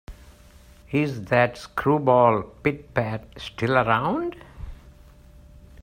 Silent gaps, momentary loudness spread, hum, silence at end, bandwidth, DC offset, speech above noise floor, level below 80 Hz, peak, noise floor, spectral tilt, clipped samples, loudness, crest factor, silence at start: none; 19 LU; none; 0.9 s; 16 kHz; under 0.1%; 27 dB; -48 dBFS; -4 dBFS; -50 dBFS; -7 dB/octave; under 0.1%; -23 LUFS; 22 dB; 0.1 s